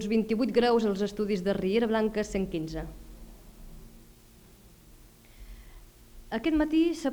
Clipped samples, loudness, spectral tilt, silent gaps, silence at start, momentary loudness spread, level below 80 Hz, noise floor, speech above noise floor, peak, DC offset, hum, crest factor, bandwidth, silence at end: under 0.1%; -28 LUFS; -6 dB/octave; none; 0 s; 15 LU; -48 dBFS; -55 dBFS; 28 dB; -12 dBFS; under 0.1%; none; 18 dB; over 20 kHz; 0 s